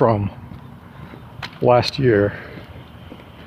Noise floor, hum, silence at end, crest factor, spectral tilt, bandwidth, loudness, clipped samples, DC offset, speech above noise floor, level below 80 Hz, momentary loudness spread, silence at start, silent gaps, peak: -39 dBFS; none; 0 s; 20 dB; -7 dB/octave; 14.5 kHz; -18 LUFS; under 0.1%; under 0.1%; 23 dB; -46 dBFS; 23 LU; 0 s; none; -2 dBFS